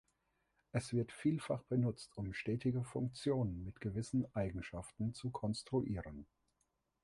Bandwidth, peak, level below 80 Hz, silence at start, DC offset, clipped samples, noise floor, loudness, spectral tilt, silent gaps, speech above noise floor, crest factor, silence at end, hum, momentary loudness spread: 11.5 kHz; -22 dBFS; -60 dBFS; 0.75 s; under 0.1%; under 0.1%; -83 dBFS; -40 LUFS; -7 dB/octave; none; 44 dB; 18 dB; 0.8 s; none; 8 LU